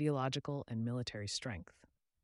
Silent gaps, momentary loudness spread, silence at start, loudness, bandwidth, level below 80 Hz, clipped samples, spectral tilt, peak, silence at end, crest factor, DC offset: none; 7 LU; 0 s; -40 LUFS; 11.5 kHz; -66 dBFS; under 0.1%; -5.5 dB/octave; -22 dBFS; 0.6 s; 18 dB; under 0.1%